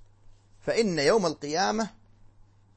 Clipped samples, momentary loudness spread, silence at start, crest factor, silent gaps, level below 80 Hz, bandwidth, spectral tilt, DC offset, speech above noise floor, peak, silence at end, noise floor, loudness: under 0.1%; 10 LU; 0.65 s; 18 dB; none; -56 dBFS; 8.8 kHz; -4 dB/octave; under 0.1%; 30 dB; -10 dBFS; 0.85 s; -56 dBFS; -27 LUFS